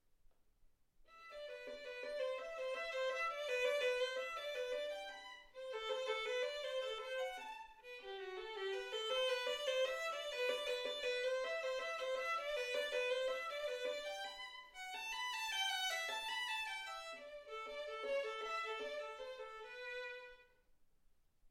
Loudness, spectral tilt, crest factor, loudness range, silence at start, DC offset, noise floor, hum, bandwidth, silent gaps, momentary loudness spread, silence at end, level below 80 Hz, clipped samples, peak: -42 LUFS; 0.5 dB/octave; 16 dB; 5 LU; 0.3 s; under 0.1%; -72 dBFS; none; 16.5 kHz; none; 12 LU; 0 s; -76 dBFS; under 0.1%; -28 dBFS